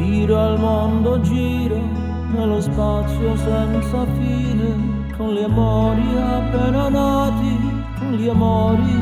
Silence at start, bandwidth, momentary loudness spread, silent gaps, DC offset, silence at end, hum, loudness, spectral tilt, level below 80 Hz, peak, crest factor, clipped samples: 0 s; 14.5 kHz; 6 LU; none; under 0.1%; 0 s; none; -19 LUFS; -8 dB/octave; -26 dBFS; -4 dBFS; 12 dB; under 0.1%